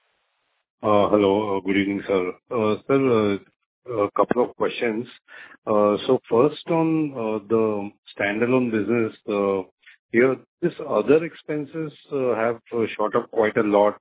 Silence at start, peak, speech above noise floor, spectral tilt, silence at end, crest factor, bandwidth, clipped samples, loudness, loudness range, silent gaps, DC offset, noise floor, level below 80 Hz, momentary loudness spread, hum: 0.8 s; -2 dBFS; 50 dB; -10.5 dB/octave; 0.05 s; 20 dB; 4 kHz; under 0.1%; -22 LUFS; 2 LU; 3.66-3.82 s, 5.58-5.62 s, 7.98-8.03 s, 9.71-9.78 s, 9.99-10.09 s, 10.48-10.58 s; under 0.1%; -72 dBFS; -60 dBFS; 10 LU; none